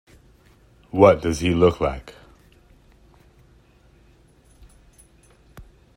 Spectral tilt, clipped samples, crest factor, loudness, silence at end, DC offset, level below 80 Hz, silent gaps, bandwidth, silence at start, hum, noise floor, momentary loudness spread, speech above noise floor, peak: -6.5 dB/octave; under 0.1%; 24 dB; -19 LUFS; 0.35 s; under 0.1%; -44 dBFS; none; 15.5 kHz; 0.95 s; none; -54 dBFS; 14 LU; 36 dB; 0 dBFS